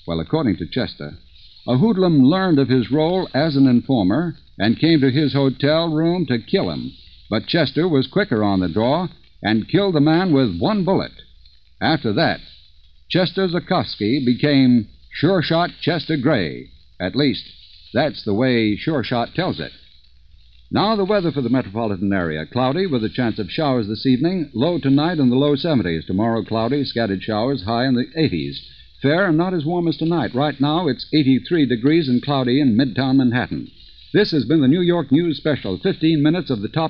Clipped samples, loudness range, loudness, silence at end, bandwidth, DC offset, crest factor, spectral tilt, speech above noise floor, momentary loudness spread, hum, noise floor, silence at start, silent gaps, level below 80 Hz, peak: under 0.1%; 4 LU; -19 LUFS; 0 s; 5.6 kHz; 0.3%; 16 dB; -5.5 dB/octave; 32 dB; 8 LU; none; -50 dBFS; 0.05 s; none; -48 dBFS; -2 dBFS